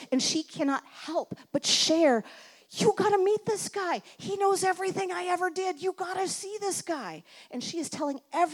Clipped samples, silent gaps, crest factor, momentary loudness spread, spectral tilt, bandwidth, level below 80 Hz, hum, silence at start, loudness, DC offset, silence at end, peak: under 0.1%; none; 18 dB; 11 LU; -3 dB/octave; 18 kHz; -78 dBFS; none; 0 s; -28 LUFS; under 0.1%; 0 s; -12 dBFS